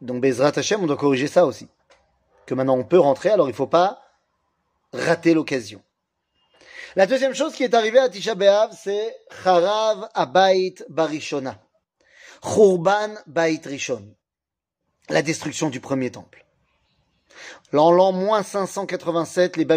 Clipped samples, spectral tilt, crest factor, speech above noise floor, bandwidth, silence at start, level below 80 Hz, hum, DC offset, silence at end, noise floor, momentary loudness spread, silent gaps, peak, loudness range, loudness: under 0.1%; -5 dB/octave; 18 dB; 67 dB; 15.5 kHz; 0 s; -68 dBFS; none; under 0.1%; 0 s; -87 dBFS; 11 LU; none; -2 dBFS; 6 LU; -20 LUFS